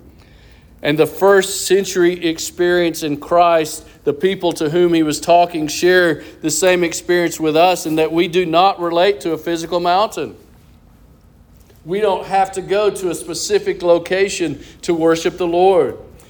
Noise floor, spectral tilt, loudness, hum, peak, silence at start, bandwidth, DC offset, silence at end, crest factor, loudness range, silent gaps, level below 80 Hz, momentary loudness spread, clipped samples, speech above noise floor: -46 dBFS; -4 dB/octave; -16 LUFS; none; -2 dBFS; 0.85 s; over 20 kHz; under 0.1%; 0.25 s; 16 dB; 5 LU; none; -48 dBFS; 9 LU; under 0.1%; 31 dB